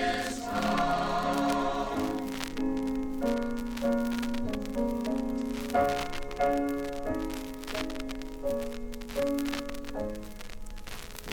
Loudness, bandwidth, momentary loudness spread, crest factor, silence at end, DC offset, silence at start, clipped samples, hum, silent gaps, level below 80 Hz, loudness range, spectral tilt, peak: -32 LUFS; 19.5 kHz; 11 LU; 22 dB; 0 s; under 0.1%; 0 s; under 0.1%; none; none; -44 dBFS; 5 LU; -5 dB/octave; -10 dBFS